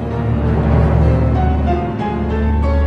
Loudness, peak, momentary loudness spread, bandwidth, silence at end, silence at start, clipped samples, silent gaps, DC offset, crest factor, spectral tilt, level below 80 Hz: -16 LUFS; -2 dBFS; 5 LU; 5 kHz; 0 s; 0 s; under 0.1%; none; under 0.1%; 12 dB; -10 dB/octave; -18 dBFS